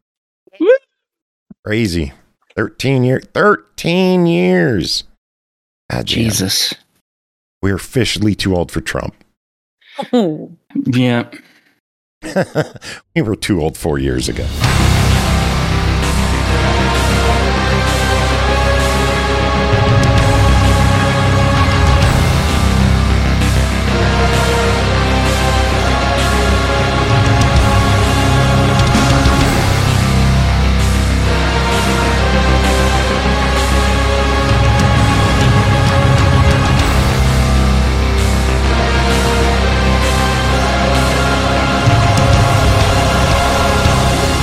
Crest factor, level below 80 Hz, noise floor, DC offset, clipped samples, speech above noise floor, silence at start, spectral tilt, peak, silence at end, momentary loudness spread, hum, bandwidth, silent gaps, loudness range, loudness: 12 dB; -18 dBFS; under -90 dBFS; under 0.1%; under 0.1%; over 75 dB; 0.6 s; -5 dB/octave; 0 dBFS; 0 s; 7 LU; none; 15.5 kHz; 1.22-1.46 s, 1.59-1.63 s, 5.18-5.89 s, 7.01-7.61 s, 9.37-9.78 s, 11.80-12.21 s; 7 LU; -13 LUFS